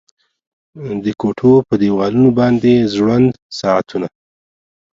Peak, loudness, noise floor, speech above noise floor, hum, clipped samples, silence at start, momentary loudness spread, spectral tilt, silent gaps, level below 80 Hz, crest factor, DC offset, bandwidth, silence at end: 0 dBFS; -14 LUFS; under -90 dBFS; over 77 dB; none; under 0.1%; 0.75 s; 12 LU; -7.5 dB/octave; 3.42-3.50 s; -50 dBFS; 14 dB; under 0.1%; 7.6 kHz; 0.85 s